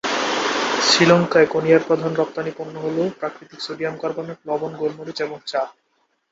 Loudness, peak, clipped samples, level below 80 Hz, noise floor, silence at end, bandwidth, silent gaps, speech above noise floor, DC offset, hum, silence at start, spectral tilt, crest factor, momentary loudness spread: -20 LUFS; -2 dBFS; under 0.1%; -64 dBFS; -68 dBFS; 0.6 s; 8 kHz; none; 47 dB; under 0.1%; none; 0.05 s; -4 dB/octave; 20 dB; 15 LU